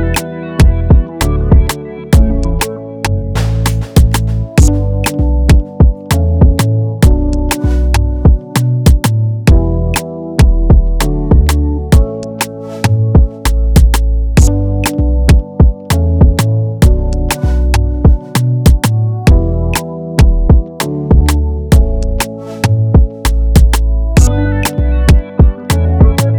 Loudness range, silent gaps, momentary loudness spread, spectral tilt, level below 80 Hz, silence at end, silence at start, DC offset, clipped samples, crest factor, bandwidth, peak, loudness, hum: 1 LU; none; 7 LU; -6 dB/octave; -12 dBFS; 0 s; 0 s; under 0.1%; under 0.1%; 10 dB; 20 kHz; 0 dBFS; -12 LUFS; none